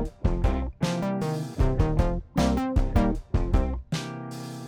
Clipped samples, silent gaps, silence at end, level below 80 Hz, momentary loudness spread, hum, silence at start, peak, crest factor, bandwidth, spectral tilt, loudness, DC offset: under 0.1%; none; 0 s; -28 dBFS; 7 LU; none; 0 s; -10 dBFS; 16 dB; over 20 kHz; -7 dB/octave; -27 LUFS; under 0.1%